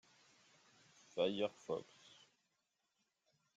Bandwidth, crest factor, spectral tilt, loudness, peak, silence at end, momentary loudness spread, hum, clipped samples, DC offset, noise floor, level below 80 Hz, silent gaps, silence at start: 7.8 kHz; 24 dB; -5 dB/octave; -42 LUFS; -24 dBFS; 1.75 s; 24 LU; none; under 0.1%; under 0.1%; -86 dBFS; -88 dBFS; none; 1.15 s